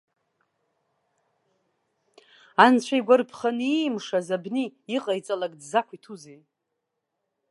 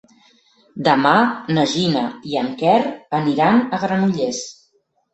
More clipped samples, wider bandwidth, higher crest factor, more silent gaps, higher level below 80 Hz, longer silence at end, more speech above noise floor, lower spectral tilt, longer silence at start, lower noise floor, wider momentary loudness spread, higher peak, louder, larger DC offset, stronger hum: neither; first, 11.5 kHz vs 8.2 kHz; first, 26 dB vs 18 dB; neither; second, -80 dBFS vs -60 dBFS; first, 1.15 s vs 0.6 s; first, 57 dB vs 46 dB; about the same, -4.5 dB/octave vs -5.5 dB/octave; first, 2.6 s vs 0.75 s; first, -81 dBFS vs -63 dBFS; first, 14 LU vs 9 LU; about the same, -2 dBFS vs 0 dBFS; second, -24 LUFS vs -18 LUFS; neither; neither